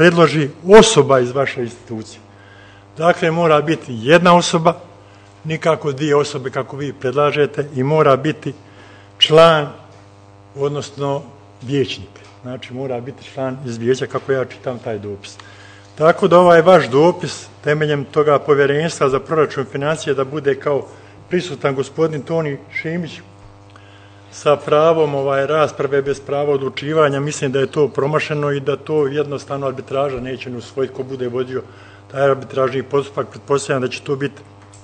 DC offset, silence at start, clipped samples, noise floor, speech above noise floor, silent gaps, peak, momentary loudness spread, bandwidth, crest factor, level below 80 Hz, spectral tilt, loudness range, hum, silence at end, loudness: under 0.1%; 0 s; 0.2%; -43 dBFS; 27 dB; none; 0 dBFS; 16 LU; 9.8 kHz; 16 dB; -52 dBFS; -5 dB/octave; 9 LU; none; 0.05 s; -16 LUFS